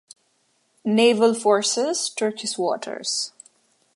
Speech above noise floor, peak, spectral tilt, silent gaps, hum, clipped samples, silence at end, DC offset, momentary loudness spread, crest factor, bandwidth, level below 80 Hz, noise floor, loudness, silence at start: 46 dB; -4 dBFS; -3 dB/octave; none; none; under 0.1%; 0.65 s; under 0.1%; 9 LU; 18 dB; 11.5 kHz; -78 dBFS; -67 dBFS; -22 LUFS; 0.85 s